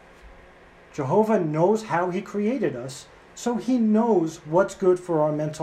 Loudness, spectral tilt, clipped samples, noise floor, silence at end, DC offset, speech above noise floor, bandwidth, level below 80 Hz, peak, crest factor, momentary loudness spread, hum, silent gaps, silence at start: -23 LUFS; -7 dB/octave; under 0.1%; -50 dBFS; 0 s; under 0.1%; 27 dB; 13.5 kHz; -58 dBFS; -8 dBFS; 16 dB; 13 LU; none; none; 0.25 s